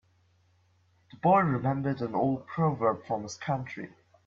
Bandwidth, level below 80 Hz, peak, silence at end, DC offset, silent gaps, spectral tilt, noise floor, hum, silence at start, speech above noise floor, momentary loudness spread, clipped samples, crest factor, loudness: 7.6 kHz; -64 dBFS; -10 dBFS; 0.4 s; under 0.1%; none; -7.5 dB/octave; -67 dBFS; none; 1.25 s; 39 dB; 11 LU; under 0.1%; 20 dB; -29 LUFS